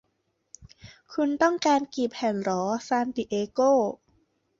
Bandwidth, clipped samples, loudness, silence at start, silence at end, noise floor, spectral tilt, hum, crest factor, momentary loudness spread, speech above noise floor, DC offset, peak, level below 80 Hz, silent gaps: 7.8 kHz; under 0.1%; -26 LUFS; 0.6 s; 0.65 s; -75 dBFS; -4.5 dB/octave; none; 18 dB; 8 LU; 50 dB; under 0.1%; -10 dBFS; -66 dBFS; none